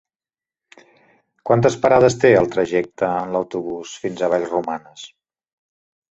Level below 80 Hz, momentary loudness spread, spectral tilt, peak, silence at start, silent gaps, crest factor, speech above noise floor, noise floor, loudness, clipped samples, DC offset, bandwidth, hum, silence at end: -54 dBFS; 16 LU; -6 dB/octave; -2 dBFS; 1.45 s; none; 18 dB; over 72 dB; under -90 dBFS; -18 LUFS; under 0.1%; under 0.1%; 8.2 kHz; none; 1.05 s